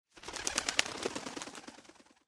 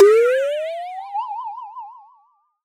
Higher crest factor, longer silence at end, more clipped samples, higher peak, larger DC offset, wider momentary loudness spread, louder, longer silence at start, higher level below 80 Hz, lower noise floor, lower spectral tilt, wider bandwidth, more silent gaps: first, 32 dB vs 18 dB; second, 0.25 s vs 0.7 s; neither; second, -6 dBFS vs -2 dBFS; neither; about the same, 19 LU vs 21 LU; second, -36 LUFS vs -21 LUFS; first, 0.15 s vs 0 s; first, -64 dBFS vs under -90 dBFS; about the same, -59 dBFS vs -59 dBFS; about the same, -0.5 dB/octave vs -1.5 dB/octave; first, 15 kHz vs 12.5 kHz; neither